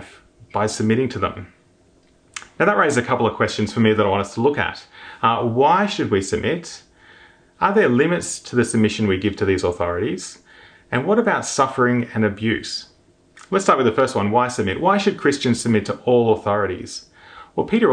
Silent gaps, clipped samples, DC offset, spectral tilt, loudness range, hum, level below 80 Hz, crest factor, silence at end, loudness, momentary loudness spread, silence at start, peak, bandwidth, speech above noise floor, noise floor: none; under 0.1%; under 0.1%; -5 dB/octave; 2 LU; none; -52 dBFS; 20 dB; 0 s; -19 LUFS; 12 LU; 0 s; 0 dBFS; 10 kHz; 37 dB; -56 dBFS